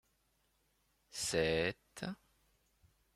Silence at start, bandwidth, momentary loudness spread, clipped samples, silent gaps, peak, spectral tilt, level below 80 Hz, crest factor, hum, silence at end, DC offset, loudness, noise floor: 1.15 s; 15.5 kHz; 15 LU; under 0.1%; none; -20 dBFS; -3.5 dB/octave; -64 dBFS; 22 dB; none; 1 s; under 0.1%; -37 LUFS; -78 dBFS